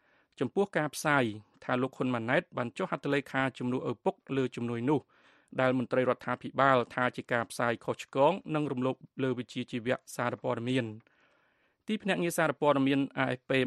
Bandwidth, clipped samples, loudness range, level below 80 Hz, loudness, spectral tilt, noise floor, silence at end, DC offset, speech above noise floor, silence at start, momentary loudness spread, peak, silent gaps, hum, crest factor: 13 kHz; under 0.1%; 4 LU; -72 dBFS; -31 LUFS; -5.5 dB/octave; -72 dBFS; 0 s; under 0.1%; 41 dB; 0.4 s; 7 LU; -10 dBFS; none; none; 22 dB